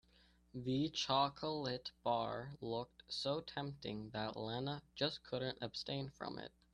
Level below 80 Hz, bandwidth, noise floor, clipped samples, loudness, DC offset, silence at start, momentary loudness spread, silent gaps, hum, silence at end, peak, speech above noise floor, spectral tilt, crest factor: -70 dBFS; 11 kHz; -70 dBFS; under 0.1%; -42 LUFS; under 0.1%; 0.55 s; 10 LU; none; none; 0.25 s; -20 dBFS; 28 dB; -5 dB/octave; 22 dB